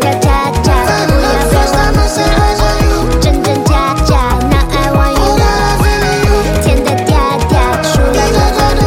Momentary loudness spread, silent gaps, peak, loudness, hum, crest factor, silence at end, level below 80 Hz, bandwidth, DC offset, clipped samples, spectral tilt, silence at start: 1 LU; none; 0 dBFS; -11 LUFS; none; 8 dB; 0 s; -14 dBFS; 16.5 kHz; under 0.1%; under 0.1%; -5 dB/octave; 0 s